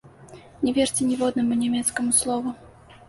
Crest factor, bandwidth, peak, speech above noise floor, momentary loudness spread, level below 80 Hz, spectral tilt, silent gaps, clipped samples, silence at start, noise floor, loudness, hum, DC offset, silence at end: 18 dB; 12 kHz; -8 dBFS; 24 dB; 8 LU; -56 dBFS; -3 dB/octave; none; under 0.1%; 0.05 s; -46 dBFS; -23 LUFS; none; under 0.1%; 0.15 s